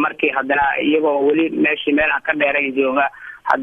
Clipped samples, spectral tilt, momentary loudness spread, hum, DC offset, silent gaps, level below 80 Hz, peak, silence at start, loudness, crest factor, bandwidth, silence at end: under 0.1%; -6.5 dB/octave; 3 LU; none; under 0.1%; none; -52 dBFS; 0 dBFS; 0 s; -17 LUFS; 18 dB; 5.8 kHz; 0 s